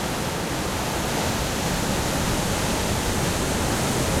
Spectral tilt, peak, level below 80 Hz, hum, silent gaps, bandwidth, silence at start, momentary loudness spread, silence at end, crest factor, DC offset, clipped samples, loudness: -4 dB/octave; -10 dBFS; -34 dBFS; none; none; 16.5 kHz; 0 s; 3 LU; 0 s; 14 dB; under 0.1%; under 0.1%; -24 LUFS